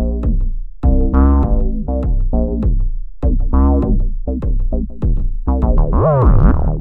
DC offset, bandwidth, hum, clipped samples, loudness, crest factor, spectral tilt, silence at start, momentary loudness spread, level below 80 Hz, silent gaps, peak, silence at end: under 0.1%; 2.1 kHz; none; under 0.1%; -17 LUFS; 12 dB; -12.5 dB/octave; 0 s; 9 LU; -14 dBFS; none; 0 dBFS; 0 s